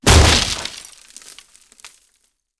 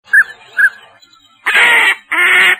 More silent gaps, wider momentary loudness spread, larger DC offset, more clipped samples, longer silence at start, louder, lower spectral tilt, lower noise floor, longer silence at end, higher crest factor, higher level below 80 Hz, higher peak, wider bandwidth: neither; first, 27 LU vs 7 LU; neither; neither; about the same, 0.05 s vs 0.1 s; second, -14 LUFS vs -10 LUFS; first, -3 dB/octave vs 0.5 dB/octave; first, -65 dBFS vs -46 dBFS; first, 1.8 s vs 0 s; first, 18 dB vs 12 dB; first, -24 dBFS vs -64 dBFS; about the same, 0 dBFS vs 0 dBFS; second, 11 kHz vs 15 kHz